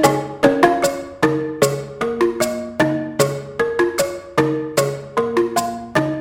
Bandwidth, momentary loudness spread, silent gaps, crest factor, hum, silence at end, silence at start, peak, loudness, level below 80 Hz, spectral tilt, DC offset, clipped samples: 17 kHz; 6 LU; none; 18 dB; none; 0 s; 0 s; 0 dBFS; -19 LUFS; -50 dBFS; -5 dB/octave; under 0.1%; under 0.1%